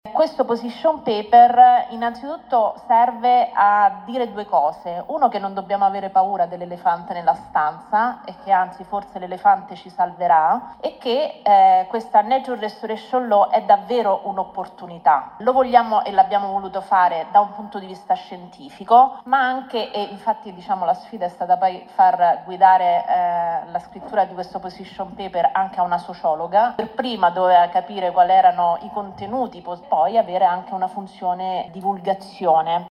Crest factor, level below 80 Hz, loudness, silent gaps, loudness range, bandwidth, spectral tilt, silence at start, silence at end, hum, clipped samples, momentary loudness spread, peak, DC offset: 18 dB; -62 dBFS; -19 LUFS; none; 4 LU; 9 kHz; -6 dB/octave; 0.05 s; 0 s; none; under 0.1%; 13 LU; 0 dBFS; under 0.1%